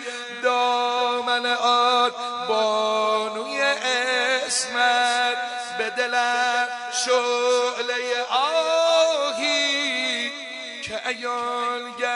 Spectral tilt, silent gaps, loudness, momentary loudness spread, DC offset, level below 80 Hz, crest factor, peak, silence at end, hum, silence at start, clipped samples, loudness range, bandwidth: 0 dB/octave; none; -22 LUFS; 8 LU; under 0.1%; -72 dBFS; 16 dB; -8 dBFS; 0 s; none; 0 s; under 0.1%; 1 LU; 11.5 kHz